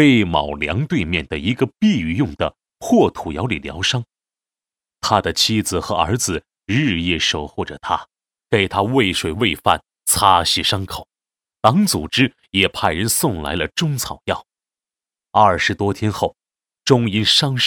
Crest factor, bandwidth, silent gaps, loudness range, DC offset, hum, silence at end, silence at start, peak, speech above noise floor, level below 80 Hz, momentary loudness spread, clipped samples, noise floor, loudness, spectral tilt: 18 dB; 18 kHz; none; 3 LU; under 0.1%; none; 0 s; 0 s; 0 dBFS; over 72 dB; -42 dBFS; 10 LU; under 0.1%; under -90 dBFS; -18 LUFS; -4 dB/octave